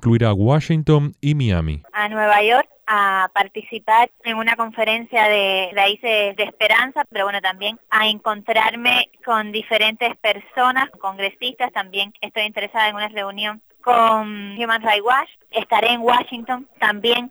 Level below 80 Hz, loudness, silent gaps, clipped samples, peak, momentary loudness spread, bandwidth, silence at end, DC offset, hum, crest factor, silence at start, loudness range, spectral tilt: -46 dBFS; -18 LUFS; none; under 0.1%; -2 dBFS; 9 LU; over 20 kHz; 0 s; under 0.1%; none; 16 dB; 0 s; 3 LU; -5.5 dB/octave